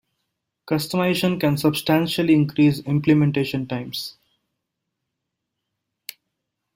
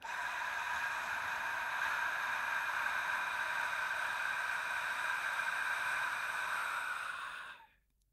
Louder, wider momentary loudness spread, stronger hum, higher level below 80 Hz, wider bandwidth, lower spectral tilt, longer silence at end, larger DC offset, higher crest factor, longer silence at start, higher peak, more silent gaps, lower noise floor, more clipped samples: first, -21 LUFS vs -36 LUFS; first, 17 LU vs 4 LU; neither; first, -58 dBFS vs -76 dBFS; about the same, 16.5 kHz vs 16 kHz; first, -6.5 dB/octave vs 0 dB/octave; first, 2.65 s vs 0.5 s; neither; about the same, 18 dB vs 14 dB; first, 0.65 s vs 0 s; first, -6 dBFS vs -24 dBFS; neither; first, -80 dBFS vs -68 dBFS; neither